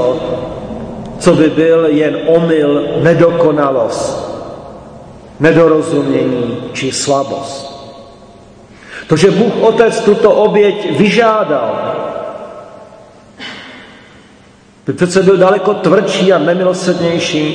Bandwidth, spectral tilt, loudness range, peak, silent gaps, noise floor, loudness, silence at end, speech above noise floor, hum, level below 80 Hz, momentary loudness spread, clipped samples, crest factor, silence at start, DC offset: 9.8 kHz; -5.5 dB/octave; 7 LU; 0 dBFS; none; -42 dBFS; -11 LUFS; 0 s; 32 dB; none; -44 dBFS; 18 LU; 0.3%; 12 dB; 0 s; under 0.1%